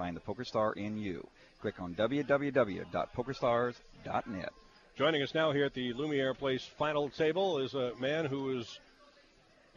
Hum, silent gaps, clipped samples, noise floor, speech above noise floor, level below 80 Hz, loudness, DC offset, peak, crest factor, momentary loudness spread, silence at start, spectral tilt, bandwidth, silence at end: none; none; under 0.1%; -64 dBFS; 30 dB; -64 dBFS; -34 LUFS; under 0.1%; -16 dBFS; 18 dB; 11 LU; 0 s; -6 dB/octave; 7.4 kHz; 1 s